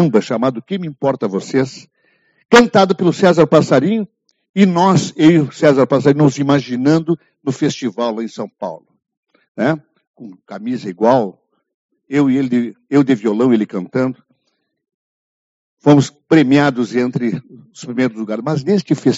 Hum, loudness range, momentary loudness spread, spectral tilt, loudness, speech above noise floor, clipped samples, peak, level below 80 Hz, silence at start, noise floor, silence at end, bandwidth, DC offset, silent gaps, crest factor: none; 8 LU; 13 LU; -6 dB/octave; -15 LUFS; 54 dB; under 0.1%; 0 dBFS; -56 dBFS; 0 s; -69 dBFS; 0 s; 8 kHz; under 0.1%; 4.49-4.54 s, 9.17-9.23 s, 9.48-9.55 s, 10.07-10.14 s, 11.74-11.89 s, 14.94-15.77 s; 16 dB